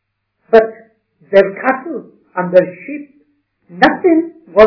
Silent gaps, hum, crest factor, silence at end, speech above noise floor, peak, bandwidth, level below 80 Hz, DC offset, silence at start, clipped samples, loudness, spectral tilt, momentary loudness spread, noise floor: none; none; 14 dB; 0 s; 47 dB; 0 dBFS; 5.4 kHz; -50 dBFS; under 0.1%; 0.5 s; 1%; -14 LUFS; -7.5 dB/octave; 16 LU; -59 dBFS